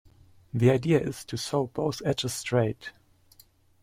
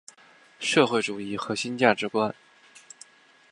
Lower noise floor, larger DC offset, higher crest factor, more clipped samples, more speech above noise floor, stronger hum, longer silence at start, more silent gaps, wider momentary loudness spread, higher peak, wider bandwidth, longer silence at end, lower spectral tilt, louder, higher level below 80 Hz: about the same, -59 dBFS vs -56 dBFS; neither; second, 20 dB vs 26 dB; neither; about the same, 33 dB vs 31 dB; neither; about the same, 0.55 s vs 0.6 s; neither; second, 11 LU vs 24 LU; second, -8 dBFS vs -2 dBFS; first, 16 kHz vs 11.5 kHz; second, 0.9 s vs 1.2 s; first, -6 dB/octave vs -4 dB/octave; about the same, -27 LUFS vs -25 LUFS; first, -58 dBFS vs -70 dBFS